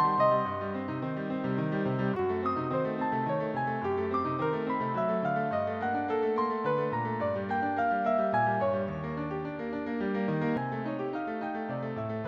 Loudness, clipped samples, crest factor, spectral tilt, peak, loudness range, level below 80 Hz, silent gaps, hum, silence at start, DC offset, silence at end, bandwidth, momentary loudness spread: -31 LUFS; under 0.1%; 16 dB; -9 dB/octave; -14 dBFS; 2 LU; -62 dBFS; none; none; 0 s; under 0.1%; 0 s; 7 kHz; 7 LU